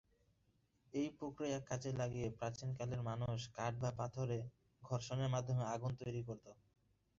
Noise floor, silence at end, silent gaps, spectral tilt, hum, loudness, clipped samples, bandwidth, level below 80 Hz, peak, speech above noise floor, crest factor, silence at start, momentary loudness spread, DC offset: -78 dBFS; 0.65 s; none; -6.5 dB/octave; none; -43 LUFS; under 0.1%; 7.6 kHz; -68 dBFS; -26 dBFS; 36 dB; 16 dB; 0.95 s; 6 LU; under 0.1%